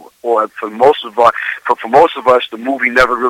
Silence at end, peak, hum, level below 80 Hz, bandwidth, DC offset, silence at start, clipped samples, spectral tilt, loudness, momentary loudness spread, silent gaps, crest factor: 0 s; 0 dBFS; none; -46 dBFS; 15.5 kHz; under 0.1%; 0.25 s; 0.5%; -4.5 dB/octave; -13 LUFS; 8 LU; none; 12 dB